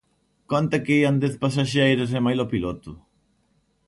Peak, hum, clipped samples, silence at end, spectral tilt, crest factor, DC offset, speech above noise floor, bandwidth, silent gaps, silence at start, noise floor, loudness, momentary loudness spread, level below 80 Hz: -8 dBFS; none; under 0.1%; 0.9 s; -6.5 dB/octave; 16 dB; under 0.1%; 45 dB; 11.5 kHz; none; 0.5 s; -66 dBFS; -22 LUFS; 9 LU; -52 dBFS